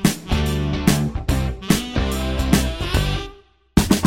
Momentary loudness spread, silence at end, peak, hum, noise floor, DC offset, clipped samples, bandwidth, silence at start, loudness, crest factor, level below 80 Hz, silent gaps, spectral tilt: 4 LU; 0 s; 0 dBFS; none; -45 dBFS; under 0.1%; under 0.1%; 16.5 kHz; 0 s; -21 LUFS; 20 dB; -26 dBFS; none; -5 dB/octave